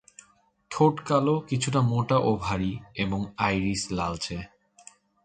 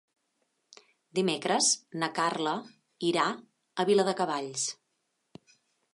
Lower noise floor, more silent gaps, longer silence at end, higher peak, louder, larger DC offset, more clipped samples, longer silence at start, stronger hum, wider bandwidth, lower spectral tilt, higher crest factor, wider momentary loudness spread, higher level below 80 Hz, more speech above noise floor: second, -63 dBFS vs -79 dBFS; neither; second, 0.8 s vs 1.2 s; first, -8 dBFS vs -12 dBFS; first, -26 LUFS vs -29 LUFS; neither; neither; second, 0.7 s vs 1.15 s; neither; second, 9.4 kHz vs 11.5 kHz; first, -6 dB/octave vs -3 dB/octave; about the same, 18 dB vs 20 dB; about the same, 9 LU vs 11 LU; first, -50 dBFS vs -84 dBFS; second, 37 dB vs 50 dB